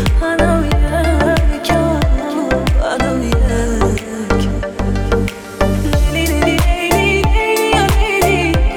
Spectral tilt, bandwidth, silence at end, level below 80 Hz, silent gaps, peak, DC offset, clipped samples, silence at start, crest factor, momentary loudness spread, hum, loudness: -5.5 dB/octave; 17.5 kHz; 0 s; -18 dBFS; none; 0 dBFS; under 0.1%; under 0.1%; 0 s; 12 dB; 5 LU; none; -15 LUFS